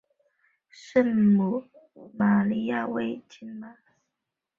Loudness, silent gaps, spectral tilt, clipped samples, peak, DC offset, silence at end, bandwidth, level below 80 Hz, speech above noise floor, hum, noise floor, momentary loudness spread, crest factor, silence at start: -25 LUFS; none; -8.5 dB/octave; under 0.1%; -8 dBFS; under 0.1%; 0.85 s; 7 kHz; -68 dBFS; 60 dB; none; -85 dBFS; 20 LU; 18 dB; 0.85 s